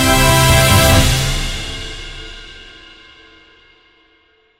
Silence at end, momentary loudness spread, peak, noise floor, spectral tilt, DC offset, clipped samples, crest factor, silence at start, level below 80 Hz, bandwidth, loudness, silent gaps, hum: 1.9 s; 23 LU; 0 dBFS; -55 dBFS; -3.5 dB/octave; under 0.1%; under 0.1%; 16 dB; 0 s; -24 dBFS; 16.5 kHz; -12 LUFS; none; none